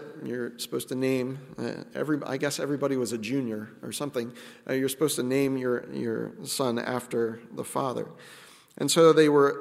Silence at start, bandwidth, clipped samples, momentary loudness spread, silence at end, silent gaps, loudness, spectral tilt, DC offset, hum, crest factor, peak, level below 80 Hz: 0 s; 16 kHz; under 0.1%; 15 LU; 0 s; none; -28 LUFS; -4.5 dB/octave; under 0.1%; none; 20 dB; -8 dBFS; -74 dBFS